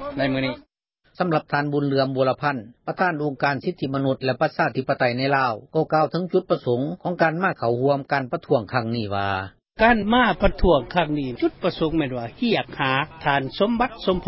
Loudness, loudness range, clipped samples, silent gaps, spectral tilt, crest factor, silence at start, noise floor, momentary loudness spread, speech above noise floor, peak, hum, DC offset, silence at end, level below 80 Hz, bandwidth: -22 LUFS; 2 LU; under 0.1%; none; -10.5 dB/octave; 18 dB; 0 s; -61 dBFS; 7 LU; 40 dB; -4 dBFS; none; under 0.1%; 0 s; -40 dBFS; 5.8 kHz